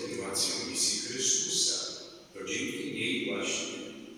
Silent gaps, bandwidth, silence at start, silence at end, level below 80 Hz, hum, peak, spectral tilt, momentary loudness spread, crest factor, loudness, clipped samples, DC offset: none; over 20 kHz; 0 s; 0 s; -72 dBFS; none; -16 dBFS; -1 dB/octave; 13 LU; 18 dB; -30 LUFS; under 0.1%; under 0.1%